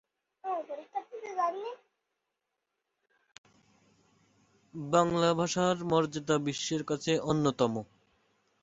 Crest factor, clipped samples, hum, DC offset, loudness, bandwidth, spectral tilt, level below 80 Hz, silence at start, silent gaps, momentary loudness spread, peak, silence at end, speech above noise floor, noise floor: 22 dB; under 0.1%; none; under 0.1%; -31 LUFS; 8 kHz; -5 dB/octave; -68 dBFS; 0.45 s; 3.38-3.44 s; 16 LU; -10 dBFS; 0.8 s; 55 dB; -85 dBFS